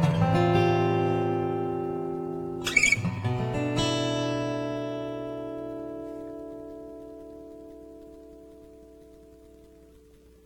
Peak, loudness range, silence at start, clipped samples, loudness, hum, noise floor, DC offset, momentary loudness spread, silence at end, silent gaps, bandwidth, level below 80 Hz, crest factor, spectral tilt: -6 dBFS; 21 LU; 0 s; under 0.1%; -27 LUFS; none; -54 dBFS; under 0.1%; 23 LU; 0.6 s; none; 16.5 kHz; -52 dBFS; 22 dB; -5.5 dB/octave